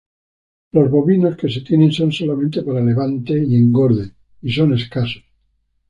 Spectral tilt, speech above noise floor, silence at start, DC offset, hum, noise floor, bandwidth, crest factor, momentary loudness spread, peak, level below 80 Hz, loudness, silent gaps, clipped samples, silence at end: -8.5 dB/octave; 49 dB; 0.75 s; under 0.1%; none; -64 dBFS; 9.4 kHz; 14 dB; 9 LU; -2 dBFS; -50 dBFS; -16 LUFS; none; under 0.1%; 0.7 s